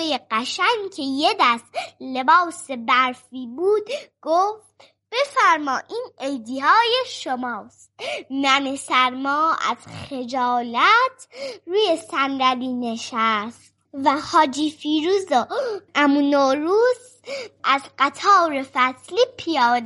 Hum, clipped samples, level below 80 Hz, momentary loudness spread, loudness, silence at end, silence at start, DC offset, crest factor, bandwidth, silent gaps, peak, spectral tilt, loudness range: none; under 0.1%; -70 dBFS; 14 LU; -20 LUFS; 0 s; 0 s; under 0.1%; 18 dB; 11.5 kHz; none; -4 dBFS; -2.5 dB/octave; 3 LU